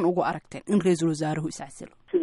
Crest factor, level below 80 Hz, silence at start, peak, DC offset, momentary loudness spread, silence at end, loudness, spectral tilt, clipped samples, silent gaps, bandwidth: 14 dB; -62 dBFS; 0 s; -12 dBFS; under 0.1%; 16 LU; 0 s; -26 LUFS; -6.5 dB/octave; under 0.1%; none; 11.5 kHz